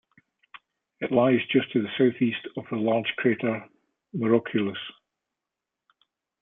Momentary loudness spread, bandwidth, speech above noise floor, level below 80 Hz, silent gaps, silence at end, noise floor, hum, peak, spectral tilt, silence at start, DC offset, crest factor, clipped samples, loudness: 13 LU; 3.9 kHz; 62 dB; -72 dBFS; none; 1.5 s; -87 dBFS; none; -8 dBFS; -10 dB/octave; 1 s; under 0.1%; 20 dB; under 0.1%; -25 LUFS